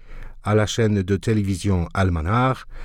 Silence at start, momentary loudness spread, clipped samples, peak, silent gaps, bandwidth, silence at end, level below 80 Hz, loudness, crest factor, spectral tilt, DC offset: 0 s; 3 LU; under 0.1%; -8 dBFS; none; 12.5 kHz; 0 s; -38 dBFS; -21 LUFS; 14 dB; -6.5 dB/octave; under 0.1%